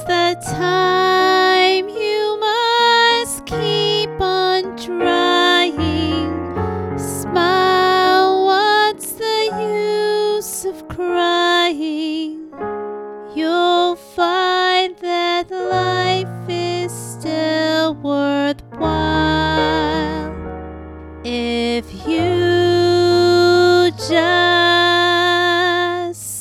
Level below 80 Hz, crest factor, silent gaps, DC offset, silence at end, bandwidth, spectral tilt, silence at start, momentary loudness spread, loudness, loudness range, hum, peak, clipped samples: -42 dBFS; 16 dB; none; under 0.1%; 0 s; 14.5 kHz; -4 dB/octave; 0 s; 12 LU; -16 LUFS; 6 LU; none; -2 dBFS; under 0.1%